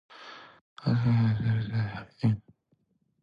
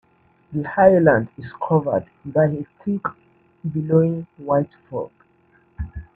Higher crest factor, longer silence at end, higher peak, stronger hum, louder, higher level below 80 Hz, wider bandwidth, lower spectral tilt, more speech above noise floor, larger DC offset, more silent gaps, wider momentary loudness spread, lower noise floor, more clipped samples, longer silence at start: second, 14 dB vs 20 dB; first, 0.85 s vs 0.15 s; second, -14 dBFS vs 0 dBFS; neither; second, -29 LUFS vs -21 LUFS; second, -56 dBFS vs -46 dBFS; first, 5.4 kHz vs 4.1 kHz; second, -9 dB/octave vs -11.5 dB/octave; first, 45 dB vs 38 dB; neither; first, 0.61-0.76 s vs none; first, 21 LU vs 17 LU; first, -72 dBFS vs -58 dBFS; neither; second, 0.15 s vs 0.5 s